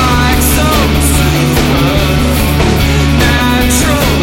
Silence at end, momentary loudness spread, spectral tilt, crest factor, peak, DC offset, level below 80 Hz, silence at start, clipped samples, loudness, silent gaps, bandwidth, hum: 0 s; 1 LU; -4.5 dB/octave; 10 dB; 0 dBFS; under 0.1%; -14 dBFS; 0 s; under 0.1%; -10 LUFS; none; 17 kHz; none